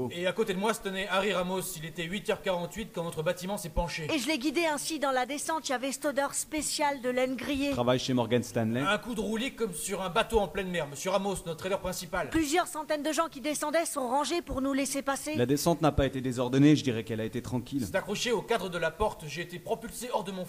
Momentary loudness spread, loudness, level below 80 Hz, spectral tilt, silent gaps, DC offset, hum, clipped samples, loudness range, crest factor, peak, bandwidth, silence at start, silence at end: 7 LU; -30 LUFS; -50 dBFS; -4.5 dB/octave; none; under 0.1%; none; under 0.1%; 4 LU; 20 dB; -10 dBFS; 15.5 kHz; 0 s; 0 s